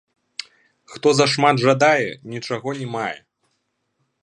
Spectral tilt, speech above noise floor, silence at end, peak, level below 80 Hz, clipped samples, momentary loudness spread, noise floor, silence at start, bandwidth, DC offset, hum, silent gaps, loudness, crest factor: -4.5 dB/octave; 53 dB; 1.05 s; 0 dBFS; -68 dBFS; under 0.1%; 19 LU; -72 dBFS; 0.9 s; 10.5 kHz; under 0.1%; none; none; -19 LUFS; 20 dB